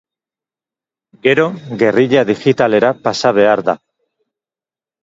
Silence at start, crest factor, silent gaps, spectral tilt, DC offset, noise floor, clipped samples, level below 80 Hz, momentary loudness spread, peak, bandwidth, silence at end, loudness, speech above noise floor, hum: 1.25 s; 16 dB; none; -5.5 dB/octave; under 0.1%; under -90 dBFS; under 0.1%; -58 dBFS; 6 LU; 0 dBFS; 7.8 kHz; 1.25 s; -13 LUFS; over 77 dB; none